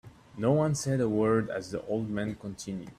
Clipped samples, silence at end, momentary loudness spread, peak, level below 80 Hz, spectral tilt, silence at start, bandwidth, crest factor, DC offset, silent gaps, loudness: under 0.1%; 0.05 s; 12 LU; -12 dBFS; -60 dBFS; -6.5 dB/octave; 0.05 s; 14 kHz; 16 dB; under 0.1%; none; -30 LUFS